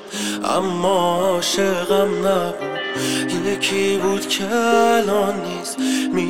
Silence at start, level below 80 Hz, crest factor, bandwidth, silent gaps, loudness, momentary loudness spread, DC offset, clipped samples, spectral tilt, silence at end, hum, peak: 0 s; -58 dBFS; 16 dB; 17 kHz; none; -19 LUFS; 7 LU; 0.8%; under 0.1%; -3.5 dB/octave; 0 s; none; -4 dBFS